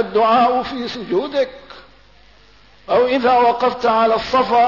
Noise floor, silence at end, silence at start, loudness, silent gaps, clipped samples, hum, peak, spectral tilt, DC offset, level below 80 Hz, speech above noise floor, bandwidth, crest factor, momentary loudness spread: -49 dBFS; 0 s; 0 s; -16 LUFS; none; under 0.1%; none; -6 dBFS; -5.5 dB/octave; 0.3%; -50 dBFS; 33 dB; 6 kHz; 12 dB; 8 LU